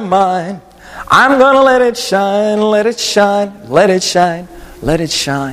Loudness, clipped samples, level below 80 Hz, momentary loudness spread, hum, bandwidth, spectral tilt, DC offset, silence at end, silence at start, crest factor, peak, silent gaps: -11 LUFS; under 0.1%; -38 dBFS; 12 LU; none; 15.5 kHz; -4 dB/octave; under 0.1%; 0 s; 0 s; 12 dB; 0 dBFS; none